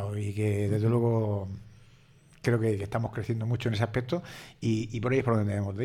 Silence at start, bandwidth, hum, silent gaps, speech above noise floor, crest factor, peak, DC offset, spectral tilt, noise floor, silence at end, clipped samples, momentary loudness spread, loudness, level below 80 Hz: 0 s; 13 kHz; none; none; 29 dB; 16 dB; -12 dBFS; under 0.1%; -7.5 dB/octave; -57 dBFS; 0 s; under 0.1%; 8 LU; -29 LUFS; -56 dBFS